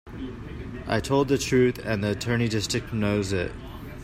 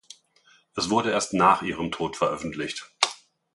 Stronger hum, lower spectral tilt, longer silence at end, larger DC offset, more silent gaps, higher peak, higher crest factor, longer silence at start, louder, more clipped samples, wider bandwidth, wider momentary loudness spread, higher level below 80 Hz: neither; first, -5.5 dB/octave vs -3.5 dB/octave; second, 0 s vs 0.4 s; neither; neither; second, -10 dBFS vs -2 dBFS; second, 16 dB vs 24 dB; second, 0.05 s vs 0.75 s; about the same, -25 LUFS vs -25 LUFS; neither; first, 16 kHz vs 11.5 kHz; first, 15 LU vs 12 LU; first, -44 dBFS vs -58 dBFS